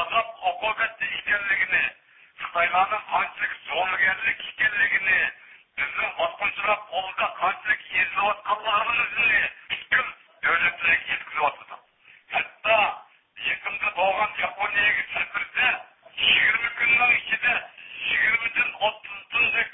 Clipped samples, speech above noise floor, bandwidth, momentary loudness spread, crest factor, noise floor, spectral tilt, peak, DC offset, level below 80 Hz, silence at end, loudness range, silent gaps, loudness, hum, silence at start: under 0.1%; 31 dB; 4 kHz; 8 LU; 18 dB; -55 dBFS; -6 dB/octave; -8 dBFS; under 0.1%; -60 dBFS; 0 s; 4 LU; none; -23 LUFS; none; 0 s